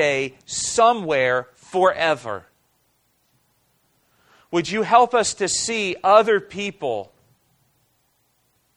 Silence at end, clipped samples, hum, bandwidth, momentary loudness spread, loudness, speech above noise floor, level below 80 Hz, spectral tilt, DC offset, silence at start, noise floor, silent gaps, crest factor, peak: 1.7 s; under 0.1%; none; 12 kHz; 12 LU; -20 LUFS; 46 dB; -60 dBFS; -2.5 dB/octave; under 0.1%; 0 s; -66 dBFS; none; 20 dB; -2 dBFS